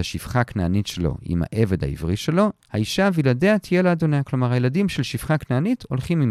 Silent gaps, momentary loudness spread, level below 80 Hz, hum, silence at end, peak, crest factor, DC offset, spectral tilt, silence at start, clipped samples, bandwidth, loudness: none; 6 LU; -40 dBFS; none; 0 s; -4 dBFS; 16 dB; under 0.1%; -6.5 dB/octave; 0 s; under 0.1%; 14.5 kHz; -22 LUFS